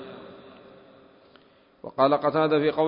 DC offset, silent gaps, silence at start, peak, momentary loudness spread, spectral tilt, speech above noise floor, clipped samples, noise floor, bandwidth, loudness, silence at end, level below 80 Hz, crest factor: under 0.1%; none; 0 s; -6 dBFS; 23 LU; -10.5 dB/octave; 35 dB; under 0.1%; -57 dBFS; 5.4 kHz; -23 LUFS; 0 s; -68 dBFS; 20 dB